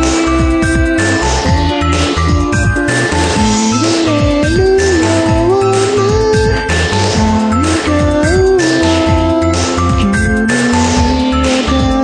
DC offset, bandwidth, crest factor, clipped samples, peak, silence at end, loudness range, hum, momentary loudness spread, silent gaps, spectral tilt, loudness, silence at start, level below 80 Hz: under 0.1%; 10.5 kHz; 10 dB; under 0.1%; 0 dBFS; 0 s; 1 LU; none; 2 LU; none; -5 dB/octave; -11 LUFS; 0 s; -20 dBFS